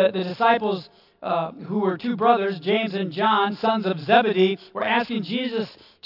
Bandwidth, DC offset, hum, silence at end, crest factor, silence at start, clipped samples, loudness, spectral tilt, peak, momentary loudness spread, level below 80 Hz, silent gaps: 5.8 kHz; under 0.1%; none; 0.35 s; 18 dB; 0 s; under 0.1%; -22 LUFS; -7.5 dB/octave; -4 dBFS; 8 LU; -74 dBFS; none